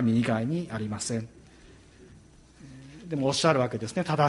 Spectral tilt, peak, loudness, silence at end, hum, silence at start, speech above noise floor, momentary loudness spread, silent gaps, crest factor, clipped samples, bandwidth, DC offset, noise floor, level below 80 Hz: -5.5 dB/octave; -8 dBFS; -28 LUFS; 0 s; none; 0 s; 27 dB; 23 LU; none; 20 dB; under 0.1%; 11.5 kHz; under 0.1%; -53 dBFS; -58 dBFS